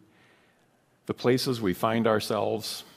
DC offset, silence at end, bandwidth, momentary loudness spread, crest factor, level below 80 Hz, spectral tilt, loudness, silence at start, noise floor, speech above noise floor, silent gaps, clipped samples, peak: under 0.1%; 0.15 s; 15.5 kHz; 8 LU; 20 dB; -66 dBFS; -5 dB/octave; -27 LUFS; 1.1 s; -65 dBFS; 39 dB; none; under 0.1%; -10 dBFS